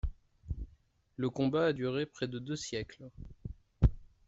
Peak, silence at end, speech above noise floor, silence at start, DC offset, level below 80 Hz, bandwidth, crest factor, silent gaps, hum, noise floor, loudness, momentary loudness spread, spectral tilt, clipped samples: -12 dBFS; 0.2 s; 31 dB; 0.05 s; under 0.1%; -42 dBFS; 8 kHz; 22 dB; none; none; -66 dBFS; -35 LUFS; 19 LU; -6.5 dB/octave; under 0.1%